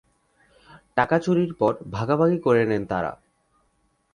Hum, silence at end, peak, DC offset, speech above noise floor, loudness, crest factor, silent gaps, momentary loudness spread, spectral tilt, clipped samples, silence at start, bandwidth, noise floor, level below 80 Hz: none; 1 s; -6 dBFS; under 0.1%; 46 dB; -23 LUFS; 20 dB; none; 8 LU; -8 dB/octave; under 0.1%; 0.95 s; 10.5 kHz; -68 dBFS; -56 dBFS